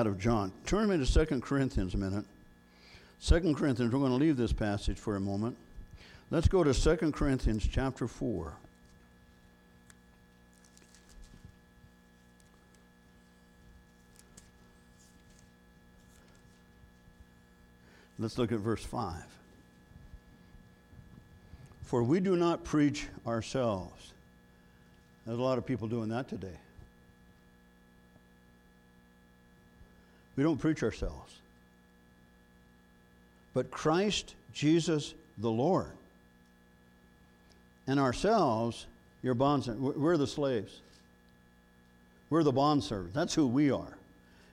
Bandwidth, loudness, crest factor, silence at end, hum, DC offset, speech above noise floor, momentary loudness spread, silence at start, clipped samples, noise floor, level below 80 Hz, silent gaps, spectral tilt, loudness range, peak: 13 kHz; -32 LUFS; 22 dB; 0.55 s; 60 Hz at -60 dBFS; under 0.1%; 32 dB; 18 LU; 0 s; under 0.1%; -62 dBFS; -44 dBFS; none; -6.5 dB/octave; 9 LU; -12 dBFS